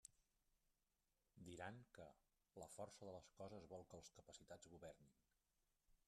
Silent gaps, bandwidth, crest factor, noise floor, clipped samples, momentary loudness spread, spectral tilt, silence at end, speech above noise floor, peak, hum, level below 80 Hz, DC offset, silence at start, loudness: none; 13 kHz; 22 dB; -90 dBFS; under 0.1%; 9 LU; -4.5 dB/octave; 0.1 s; 29 dB; -40 dBFS; none; -84 dBFS; under 0.1%; 0.05 s; -61 LUFS